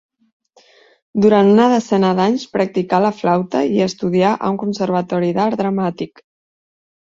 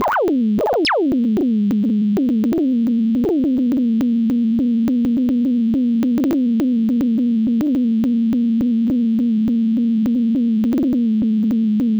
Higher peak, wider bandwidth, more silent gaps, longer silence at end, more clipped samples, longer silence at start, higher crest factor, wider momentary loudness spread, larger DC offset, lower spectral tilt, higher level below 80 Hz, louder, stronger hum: first, -2 dBFS vs -12 dBFS; first, 7.6 kHz vs 6.6 kHz; neither; first, 0.95 s vs 0 s; neither; first, 1.15 s vs 0 s; first, 16 dB vs 4 dB; first, 8 LU vs 0 LU; neither; about the same, -7 dB/octave vs -7.5 dB/octave; second, -58 dBFS vs -48 dBFS; about the same, -16 LUFS vs -17 LUFS; neither